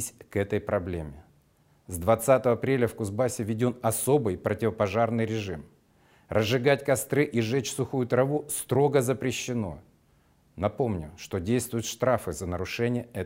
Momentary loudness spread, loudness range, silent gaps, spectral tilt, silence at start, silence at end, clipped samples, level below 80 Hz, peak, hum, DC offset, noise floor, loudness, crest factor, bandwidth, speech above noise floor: 9 LU; 4 LU; none; -5.5 dB/octave; 0 s; 0 s; under 0.1%; -58 dBFS; -8 dBFS; none; under 0.1%; -63 dBFS; -27 LUFS; 20 dB; 16 kHz; 37 dB